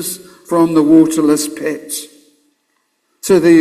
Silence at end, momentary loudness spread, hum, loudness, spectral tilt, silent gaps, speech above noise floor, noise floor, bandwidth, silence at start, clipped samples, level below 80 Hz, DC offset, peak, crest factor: 0 s; 15 LU; none; -13 LUFS; -5 dB/octave; none; 53 dB; -65 dBFS; 15.5 kHz; 0 s; under 0.1%; -56 dBFS; under 0.1%; 0 dBFS; 14 dB